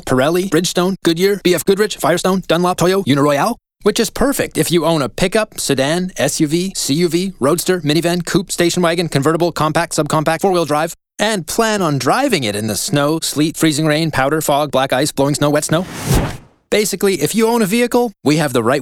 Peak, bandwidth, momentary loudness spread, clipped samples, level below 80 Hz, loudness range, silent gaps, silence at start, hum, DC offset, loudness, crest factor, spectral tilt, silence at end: -2 dBFS; 18.5 kHz; 4 LU; under 0.1%; -38 dBFS; 1 LU; none; 0.05 s; none; under 0.1%; -15 LUFS; 14 dB; -4.5 dB/octave; 0 s